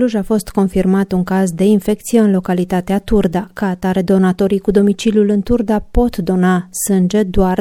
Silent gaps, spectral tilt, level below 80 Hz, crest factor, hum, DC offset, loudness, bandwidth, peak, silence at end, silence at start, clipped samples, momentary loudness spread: none; -6.5 dB/octave; -30 dBFS; 14 dB; none; under 0.1%; -15 LUFS; 16 kHz; 0 dBFS; 0 s; 0 s; under 0.1%; 4 LU